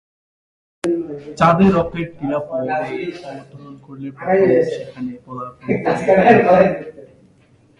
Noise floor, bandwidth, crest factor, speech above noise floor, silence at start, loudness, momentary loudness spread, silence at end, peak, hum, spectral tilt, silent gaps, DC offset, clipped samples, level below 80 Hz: -53 dBFS; 11.5 kHz; 18 dB; 36 dB; 0.85 s; -16 LUFS; 21 LU; 0.75 s; 0 dBFS; none; -7.5 dB/octave; none; under 0.1%; under 0.1%; -48 dBFS